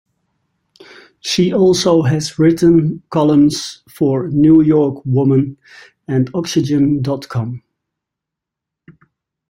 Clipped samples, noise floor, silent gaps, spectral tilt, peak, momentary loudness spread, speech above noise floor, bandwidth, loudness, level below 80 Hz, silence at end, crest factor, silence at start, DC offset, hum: under 0.1%; -82 dBFS; none; -6.5 dB/octave; -2 dBFS; 12 LU; 69 dB; 16 kHz; -14 LUFS; -50 dBFS; 1.9 s; 14 dB; 1.25 s; under 0.1%; none